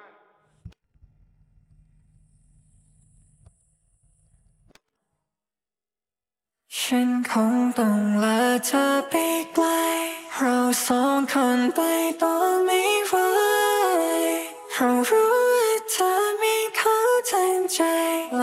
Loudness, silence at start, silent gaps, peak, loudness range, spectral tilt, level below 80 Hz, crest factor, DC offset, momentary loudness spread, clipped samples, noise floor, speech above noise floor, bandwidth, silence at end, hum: -22 LUFS; 0.65 s; none; -8 dBFS; 5 LU; -3 dB/octave; -64 dBFS; 16 dB; under 0.1%; 5 LU; under 0.1%; under -90 dBFS; over 69 dB; 16 kHz; 0 s; none